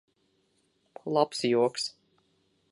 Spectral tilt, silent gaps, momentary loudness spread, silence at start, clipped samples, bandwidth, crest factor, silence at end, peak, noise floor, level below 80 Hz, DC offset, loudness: -4.5 dB/octave; none; 10 LU; 1.05 s; under 0.1%; 11.5 kHz; 22 dB; 0.8 s; -10 dBFS; -72 dBFS; -82 dBFS; under 0.1%; -28 LUFS